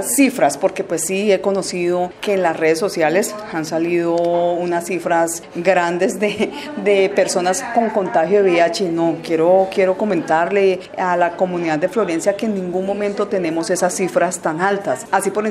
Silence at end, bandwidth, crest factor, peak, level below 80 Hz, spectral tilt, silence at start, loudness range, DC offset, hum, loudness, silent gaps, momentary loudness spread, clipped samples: 0 s; 15.5 kHz; 18 dB; 0 dBFS; -60 dBFS; -4.5 dB/octave; 0 s; 3 LU; under 0.1%; none; -18 LUFS; none; 6 LU; under 0.1%